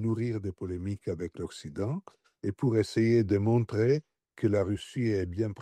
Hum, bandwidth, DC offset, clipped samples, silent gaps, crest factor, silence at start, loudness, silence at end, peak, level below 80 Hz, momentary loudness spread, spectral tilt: none; 10.5 kHz; under 0.1%; under 0.1%; none; 14 dB; 0 s; -30 LUFS; 0 s; -14 dBFS; -58 dBFS; 12 LU; -8 dB/octave